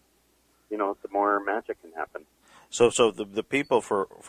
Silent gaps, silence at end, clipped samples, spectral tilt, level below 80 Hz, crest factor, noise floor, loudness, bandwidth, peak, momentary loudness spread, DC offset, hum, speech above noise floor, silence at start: none; 0 s; under 0.1%; -3.5 dB/octave; -68 dBFS; 22 dB; -66 dBFS; -26 LUFS; 14.5 kHz; -6 dBFS; 15 LU; under 0.1%; none; 40 dB; 0.7 s